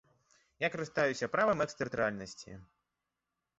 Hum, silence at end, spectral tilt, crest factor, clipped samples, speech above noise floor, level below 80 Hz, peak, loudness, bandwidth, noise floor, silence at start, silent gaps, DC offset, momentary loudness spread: none; 0.95 s; -3.5 dB/octave; 18 dB; under 0.1%; 54 dB; -68 dBFS; -18 dBFS; -33 LUFS; 8 kHz; -88 dBFS; 0.6 s; none; under 0.1%; 18 LU